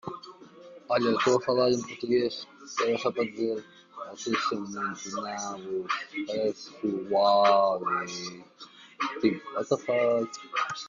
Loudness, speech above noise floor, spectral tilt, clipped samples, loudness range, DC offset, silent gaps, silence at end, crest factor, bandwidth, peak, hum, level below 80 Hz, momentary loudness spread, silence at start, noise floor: -28 LUFS; 21 dB; -4 dB/octave; under 0.1%; 5 LU; under 0.1%; none; 0 s; 20 dB; 7.4 kHz; -8 dBFS; none; -72 dBFS; 16 LU; 0.05 s; -49 dBFS